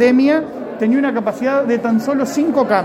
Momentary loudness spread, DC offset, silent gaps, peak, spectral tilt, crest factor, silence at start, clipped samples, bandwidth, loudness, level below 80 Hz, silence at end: 5 LU; under 0.1%; none; 0 dBFS; -6 dB/octave; 14 dB; 0 s; under 0.1%; 14 kHz; -16 LUFS; -58 dBFS; 0 s